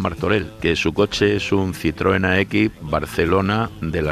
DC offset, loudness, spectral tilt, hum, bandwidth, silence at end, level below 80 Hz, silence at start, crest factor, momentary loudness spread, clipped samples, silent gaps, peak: under 0.1%; -20 LUFS; -6 dB/octave; none; 15 kHz; 0 s; -38 dBFS; 0 s; 14 dB; 5 LU; under 0.1%; none; -4 dBFS